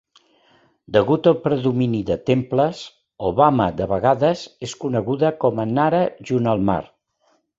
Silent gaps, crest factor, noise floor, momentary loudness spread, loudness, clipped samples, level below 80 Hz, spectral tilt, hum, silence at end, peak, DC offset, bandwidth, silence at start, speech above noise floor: none; 18 dB; -64 dBFS; 9 LU; -20 LUFS; under 0.1%; -48 dBFS; -7.5 dB/octave; none; 0.75 s; -2 dBFS; under 0.1%; 8 kHz; 0.9 s; 45 dB